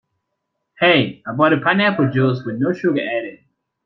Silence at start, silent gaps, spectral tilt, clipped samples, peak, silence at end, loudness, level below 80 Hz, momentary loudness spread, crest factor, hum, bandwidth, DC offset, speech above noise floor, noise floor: 0.8 s; none; -8 dB/octave; under 0.1%; -2 dBFS; 0.5 s; -17 LUFS; -62 dBFS; 9 LU; 18 dB; none; 6 kHz; under 0.1%; 59 dB; -75 dBFS